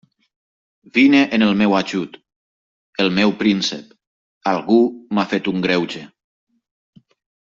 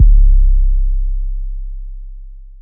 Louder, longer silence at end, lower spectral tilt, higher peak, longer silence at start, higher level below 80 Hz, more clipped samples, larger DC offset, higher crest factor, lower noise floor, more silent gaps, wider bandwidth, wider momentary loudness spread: about the same, -17 LUFS vs -18 LUFS; first, 1.35 s vs 0.15 s; second, -5.5 dB/octave vs -16.5 dB/octave; second, -4 dBFS vs 0 dBFS; first, 0.95 s vs 0 s; second, -60 dBFS vs -12 dBFS; neither; neither; about the same, 16 dB vs 12 dB; first, under -90 dBFS vs -31 dBFS; first, 2.36-2.93 s, 4.07-4.41 s vs none; first, 7.6 kHz vs 0.2 kHz; second, 13 LU vs 22 LU